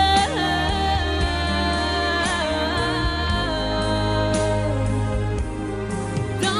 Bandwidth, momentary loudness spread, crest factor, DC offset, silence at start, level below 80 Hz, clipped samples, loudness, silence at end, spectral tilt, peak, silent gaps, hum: 13.5 kHz; 5 LU; 16 dB; under 0.1%; 0 s; -30 dBFS; under 0.1%; -22 LUFS; 0 s; -5 dB/octave; -6 dBFS; none; none